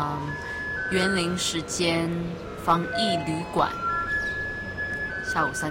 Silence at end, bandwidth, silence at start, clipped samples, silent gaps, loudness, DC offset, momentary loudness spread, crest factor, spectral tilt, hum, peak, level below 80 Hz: 0 s; 16.5 kHz; 0 s; under 0.1%; none; -26 LUFS; under 0.1%; 7 LU; 18 dB; -4 dB/octave; none; -8 dBFS; -48 dBFS